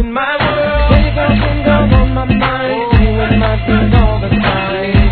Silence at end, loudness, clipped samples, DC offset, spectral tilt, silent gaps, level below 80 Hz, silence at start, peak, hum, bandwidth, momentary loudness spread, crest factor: 0 s; -12 LUFS; 0.2%; under 0.1%; -10.5 dB/octave; none; -16 dBFS; 0 s; 0 dBFS; none; 4.5 kHz; 3 LU; 10 dB